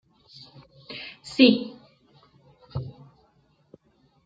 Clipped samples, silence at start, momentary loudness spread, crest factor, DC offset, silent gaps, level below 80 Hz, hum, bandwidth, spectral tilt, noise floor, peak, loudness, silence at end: under 0.1%; 0.9 s; 29 LU; 26 dB; under 0.1%; none; -60 dBFS; none; 9 kHz; -6 dB/octave; -64 dBFS; -2 dBFS; -23 LUFS; 1.35 s